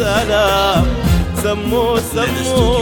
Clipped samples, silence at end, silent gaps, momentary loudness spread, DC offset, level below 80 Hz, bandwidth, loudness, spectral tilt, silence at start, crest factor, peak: under 0.1%; 0 s; none; 4 LU; under 0.1%; -24 dBFS; 18 kHz; -15 LUFS; -5 dB/octave; 0 s; 12 dB; -2 dBFS